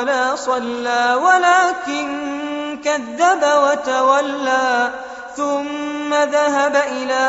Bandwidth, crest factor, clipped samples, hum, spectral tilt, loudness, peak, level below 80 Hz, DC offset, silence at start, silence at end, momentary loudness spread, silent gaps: 8 kHz; 16 dB; under 0.1%; none; -1.5 dB/octave; -17 LUFS; -2 dBFS; -60 dBFS; under 0.1%; 0 s; 0 s; 10 LU; none